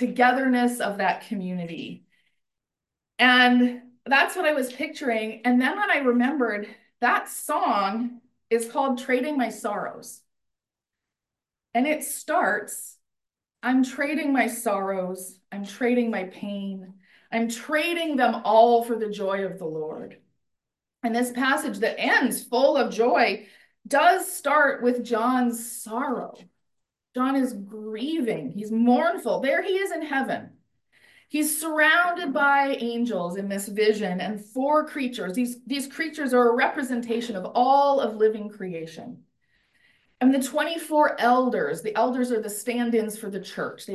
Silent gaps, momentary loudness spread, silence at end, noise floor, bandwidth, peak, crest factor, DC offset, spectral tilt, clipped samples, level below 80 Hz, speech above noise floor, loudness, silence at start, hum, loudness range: none; 13 LU; 0 s; -89 dBFS; 12.5 kHz; -6 dBFS; 20 dB; under 0.1%; -4 dB/octave; under 0.1%; -76 dBFS; 65 dB; -24 LUFS; 0 s; none; 6 LU